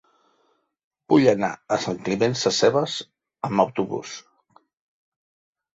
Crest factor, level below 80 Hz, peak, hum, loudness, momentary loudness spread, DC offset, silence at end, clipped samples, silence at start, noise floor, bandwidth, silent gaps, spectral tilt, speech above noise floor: 22 dB; -62 dBFS; -2 dBFS; none; -22 LUFS; 14 LU; under 0.1%; 1.55 s; under 0.1%; 1.1 s; -68 dBFS; 8 kHz; none; -4.5 dB/octave; 46 dB